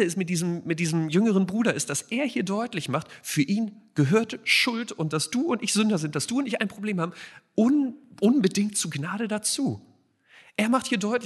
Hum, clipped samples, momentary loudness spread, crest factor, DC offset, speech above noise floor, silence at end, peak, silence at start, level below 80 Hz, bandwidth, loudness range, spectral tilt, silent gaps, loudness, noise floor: none; under 0.1%; 8 LU; 18 dB; under 0.1%; 32 dB; 0 s; -8 dBFS; 0 s; -72 dBFS; 12 kHz; 2 LU; -4.5 dB/octave; none; -25 LUFS; -58 dBFS